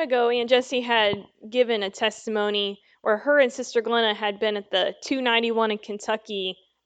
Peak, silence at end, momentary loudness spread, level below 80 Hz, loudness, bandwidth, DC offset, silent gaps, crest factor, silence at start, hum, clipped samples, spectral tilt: -6 dBFS; 0.3 s; 9 LU; -72 dBFS; -24 LUFS; 9 kHz; under 0.1%; none; 18 dB; 0 s; none; under 0.1%; -3 dB/octave